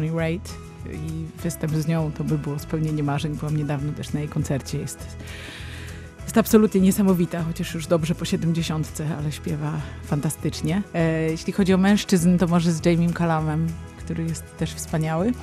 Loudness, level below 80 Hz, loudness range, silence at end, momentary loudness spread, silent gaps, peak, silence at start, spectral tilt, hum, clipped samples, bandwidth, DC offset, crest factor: -23 LUFS; -44 dBFS; 6 LU; 0 s; 15 LU; none; -2 dBFS; 0 s; -6.5 dB/octave; none; under 0.1%; 14.5 kHz; under 0.1%; 20 dB